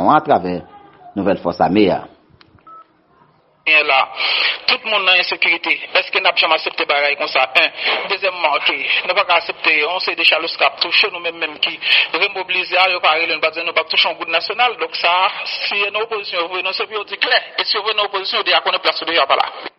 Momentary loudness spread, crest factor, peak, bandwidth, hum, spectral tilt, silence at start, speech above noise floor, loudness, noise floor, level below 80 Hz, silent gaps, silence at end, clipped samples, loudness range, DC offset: 7 LU; 18 dB; 0 dBFS; 6 kHz; none; 0.5 dB/octave; 0 s; 37 dB; -15 LUFS; -53 dBFS; -60 dBFS; none; 0.1 s; under 0.1%; 3 LU; under 0.1%